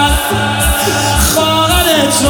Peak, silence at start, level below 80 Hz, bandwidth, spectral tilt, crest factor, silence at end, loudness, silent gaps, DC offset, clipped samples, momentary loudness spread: 0 dBFS; 0 s; -20 dBFS; 19.5 kHz; -3 dB/octave; 12 dB; 0 s; -11 LUFS; none; under 0.1%; under 0.1%; 3 LU